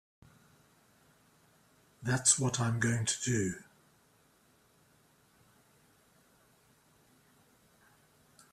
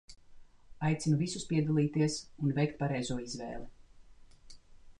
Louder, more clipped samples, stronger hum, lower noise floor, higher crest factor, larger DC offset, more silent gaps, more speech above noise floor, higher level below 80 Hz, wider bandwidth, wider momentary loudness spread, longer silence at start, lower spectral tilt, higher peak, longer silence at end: first, -30 LUFS vs -33 LUFS; neither; neither; first, -68 dBFS vs -55 dBFS; first, 28 dB vs 16 dB; neither; neither; first, 37 dB vs 23 dB; second, -68 dBFS vs -58 dBFS; first, 14 kHz vs 10.5 kHz; about the same, 12 LU vs 11 LU; first, 2 s vs 0.1 s; second, -3.5 dB/octave vs -6 dB/octave; first, -12 dBFS vs -18 dBFS; first, 4.9 s vs 0.05 s